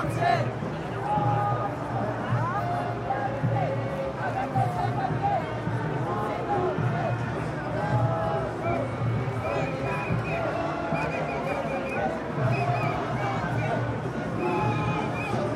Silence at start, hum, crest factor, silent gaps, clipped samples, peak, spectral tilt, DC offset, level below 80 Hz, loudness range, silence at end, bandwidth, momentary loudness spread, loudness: 0 s; none; 16 dB; none; under 0.1%; -12 dBFS; -7.5 dB/octave; under 0.1%; -48 dBFS; 1 LU; 0 s; 11.5 kHz; 4 LU; -28 LUFS